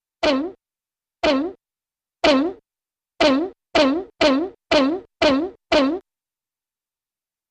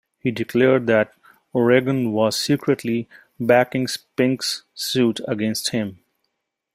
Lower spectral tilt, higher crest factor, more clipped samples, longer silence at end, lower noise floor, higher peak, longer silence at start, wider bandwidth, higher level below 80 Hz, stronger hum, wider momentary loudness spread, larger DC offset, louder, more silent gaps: about the same, -4 dB/octave vs -5 dB/octave; about the same, 18 dB vs 18 dB; neither; first, 1.5 s vs 0.8 s; first, under -90 dBFS vs -76 dBFS; about the same, -4 dBFS vs -2 dBFS; about the same, 0.2 s vs 0.25 s; second, 9.2 kHz vs 16 kHz; first, -50 dBFS vs -62 dBFS; neither; second, 6 LU vs 10 LU; neither; about the same, -20 LUFS vs -21 LUFS; neither